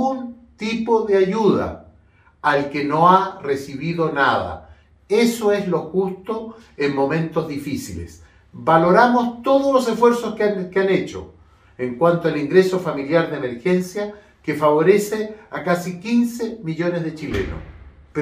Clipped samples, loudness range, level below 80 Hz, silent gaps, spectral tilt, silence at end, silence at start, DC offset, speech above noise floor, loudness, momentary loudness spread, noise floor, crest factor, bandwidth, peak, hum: under 0.1%; 4 LU; -48 dBFS; none; -6 dB/octave; 0 s; 0 s; under 0.1%; 34 dB; -19 LUFS; 14 LU; -53 dBFS; 20 dB; 15.5 kHz; 0 dBFS; none